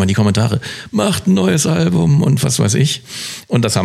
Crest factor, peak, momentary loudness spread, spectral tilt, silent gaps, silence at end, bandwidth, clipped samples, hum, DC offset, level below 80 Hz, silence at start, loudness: 12 dB; -2 dBFS; 9 LU; -5 dB/octave; none; 0 s; 14.5 kHz; under 0.1%; none; under 0.1%; -46 dBFS; 0 s; -15 LUFS